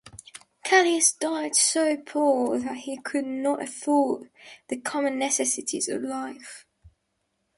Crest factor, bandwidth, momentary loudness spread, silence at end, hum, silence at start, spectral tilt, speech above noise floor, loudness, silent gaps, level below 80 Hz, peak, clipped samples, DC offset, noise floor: 20 dB; 12 kHz; 15 LU; 0.7 s; none; 0.05 s; -1 dB/octave; 51 dB; -24 LUFS; none; -68 dBFS; -6 dBFS; under 0.1%; under 0.1%; -76 dBFS